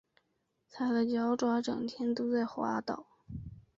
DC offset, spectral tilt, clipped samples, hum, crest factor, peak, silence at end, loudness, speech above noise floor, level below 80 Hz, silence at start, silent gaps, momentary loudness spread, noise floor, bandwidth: under 0.1%; -6 dB/octave; under 0.1%; none; 14 dB; -20 dBFS; 0.15 s; -33 LUFS; 47 dB; -62 dBFS; 0.75 s; none; 16 LU; -79 dBFS; 7.6 kHz